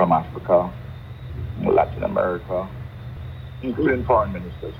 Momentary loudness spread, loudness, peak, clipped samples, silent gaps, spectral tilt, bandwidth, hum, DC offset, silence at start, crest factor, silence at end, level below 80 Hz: 16 LU; -22 LUFS; -4 dBFS; under 0.1%; none; -9.5 dB/octave; 19.5 kHz; none; under 0.1%; 0 s; 18 dB; 0 s; -40 dBFS